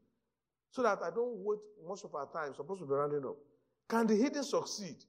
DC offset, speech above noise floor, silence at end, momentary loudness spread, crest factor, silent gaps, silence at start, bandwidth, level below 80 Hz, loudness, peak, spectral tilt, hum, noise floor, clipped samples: under 0.1%; 54 dB; 0.1 s; 14 LU; 20 dB; none; 0.75 s; 15.5 kHz; -86 dBFS; -36 LUFS; -18 dBFS; -5 dB/octave; none; -90 dBFS; under 0.1%